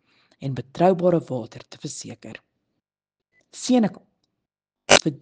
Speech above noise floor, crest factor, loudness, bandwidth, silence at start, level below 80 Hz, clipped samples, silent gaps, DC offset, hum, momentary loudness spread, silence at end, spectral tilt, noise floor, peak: 65 dB; 24 dB; -21 LUFS; 10 kHz; 0.4 s; -58 dBFS; under 0.1%; none; under 0.1%; none; 22 LU; 0.05 s; -4 dB/octave; -89 dBFS; -2 dBFS